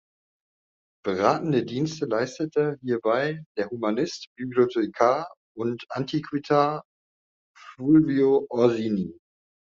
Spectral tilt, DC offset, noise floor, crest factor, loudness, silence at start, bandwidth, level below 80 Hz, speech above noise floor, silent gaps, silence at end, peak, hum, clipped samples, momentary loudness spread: -5.5 dB/octave; under 0.1%; under -90 dBFS; 20 dB; -25 LUFS; 1.05 s; 7.4 kHz; -66 dBFS; over 66 dB; 3.46-3.55 s, 4.27-4.36 s, 5.37-5.55 s, 6.85-7.54 s; 0.55 s; -6 dBFS; none; under 0.1%; 11 LU